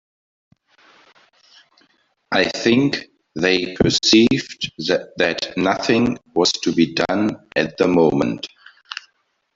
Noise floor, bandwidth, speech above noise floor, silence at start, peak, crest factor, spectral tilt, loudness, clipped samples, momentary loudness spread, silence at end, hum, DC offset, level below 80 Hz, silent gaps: -66 dBFS; 7.8 kHz; 48 dB; 2.3 s; -2 dBFS; 18 dB; -4.5 dB/octave; -18 LUFS; under 0.1%; 14 LU; 0.6 s; none; under 0.1%; -50 dBFS; none